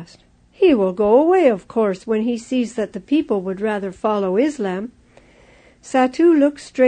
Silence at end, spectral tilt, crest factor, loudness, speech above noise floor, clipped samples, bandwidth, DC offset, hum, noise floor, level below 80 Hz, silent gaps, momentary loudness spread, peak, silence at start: 0 s; -6.5 dB/octave; 16 dB; -18 LUFS; 33 dB; under 0.1%; 9.6 kHz; under 0.1%; none; -50 dBFS; -54 dBFS; none; 9 LU; -2 dBFS; 0 s